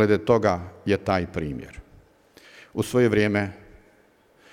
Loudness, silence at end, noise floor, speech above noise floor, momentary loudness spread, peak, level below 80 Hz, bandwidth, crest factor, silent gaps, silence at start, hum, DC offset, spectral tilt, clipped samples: -24 LUFS; 0.95 s; -59 dBFS; 36 dB; 14 LU; -6 dBFS; -50 dBFS; 16 kHz; 20 dB; none; 0 s; none; under 0.1%; -6.5 dB/octave; under 0.1%